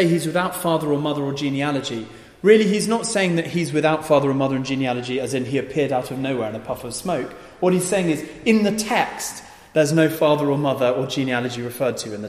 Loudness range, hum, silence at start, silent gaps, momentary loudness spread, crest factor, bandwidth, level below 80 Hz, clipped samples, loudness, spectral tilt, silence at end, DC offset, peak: 4 LU; none; 0 s; none; 9 LU; 18 dB; 15.5 kHz; -56 dBFS; under 0.1%; -21 LUFS; -5 dB/octave; 0 s; under 0.1%; -2 dBFS